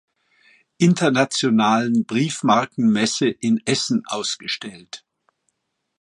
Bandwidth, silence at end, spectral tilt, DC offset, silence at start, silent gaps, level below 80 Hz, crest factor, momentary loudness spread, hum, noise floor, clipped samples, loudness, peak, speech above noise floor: 11.5 kHz; 1.05 s; -4.5 dB/octave; under 0.1%; 0.8 s; none; -66 dBFS; 18 dB; 11 LU; none; -72 dBFS; under 0.1%; -20 LUFS; -2 dBFS; 53 dB